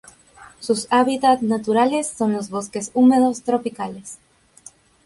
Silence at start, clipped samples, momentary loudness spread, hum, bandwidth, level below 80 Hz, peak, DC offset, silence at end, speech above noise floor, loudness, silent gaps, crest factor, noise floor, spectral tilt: 0.4 s; under 0.1%; 15 LU; none; 11.5 kHz; -62 dBFS; -4 dBFS; under 0.1%; 0.9 s; 29 dB; -19 LUFS; none; 16 dB; -48 dBFS; -4.5 dB/octave